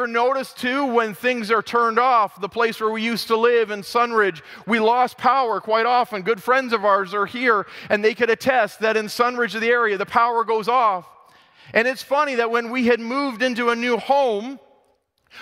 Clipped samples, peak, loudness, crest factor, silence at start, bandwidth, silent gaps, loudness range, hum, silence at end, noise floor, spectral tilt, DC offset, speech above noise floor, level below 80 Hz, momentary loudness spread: under 0.1%; -2 dBFS; -20 LUFS; 18 dB; 0 s; 16 kHz; none; 2 LU; none; 0 s; -64 dBFS; -4 dB/octave; under 0.1%; 44 dB; -66 dBFS; 5 LU